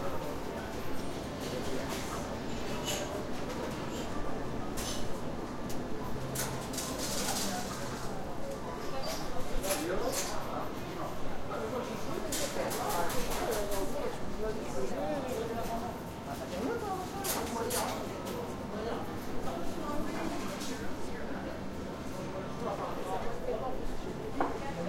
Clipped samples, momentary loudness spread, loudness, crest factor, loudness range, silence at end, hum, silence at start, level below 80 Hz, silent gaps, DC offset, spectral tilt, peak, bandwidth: under 0.1%; 6 LU; -37 LUFS; 18 dB; 3 LU; 0 s; none; 0 s; -46 dBFS; none; under 0.1%; -4 dB/octave; -16 dBFS; 16.5 kHz